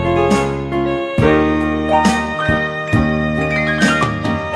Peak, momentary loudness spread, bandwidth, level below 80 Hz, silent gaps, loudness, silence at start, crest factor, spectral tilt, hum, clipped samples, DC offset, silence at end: 0 dBFS; 5 LU; 13 kHz; -32 dBFS; none; -16 LUFS; 0 s; 16 dB; -6 dB/octave; none; under 0.1%; under 0.1%; 0 s